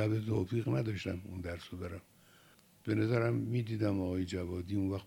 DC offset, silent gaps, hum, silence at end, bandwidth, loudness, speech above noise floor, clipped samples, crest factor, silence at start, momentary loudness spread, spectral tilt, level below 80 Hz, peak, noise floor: under 0.1%; none; none; 0 s; 16 kHz; -36 LUFS; 29 dB; under 0.1%; 16 dB; 0 s; 12 LU; -8 dB/octave; -60 dBFS; -18 dBFS; -63 dBFS